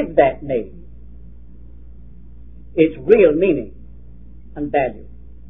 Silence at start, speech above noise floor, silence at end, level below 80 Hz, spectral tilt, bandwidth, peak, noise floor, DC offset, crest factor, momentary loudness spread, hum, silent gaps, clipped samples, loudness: 0 s; 25 dB; 0.45 s; -40 dBFS; -10 dB/octave; 3.8 kHz; 0 dBFS; -41 dBFS; 1%; 20 dB; 23 LU; none; none; under 0.1%; -17 LUFS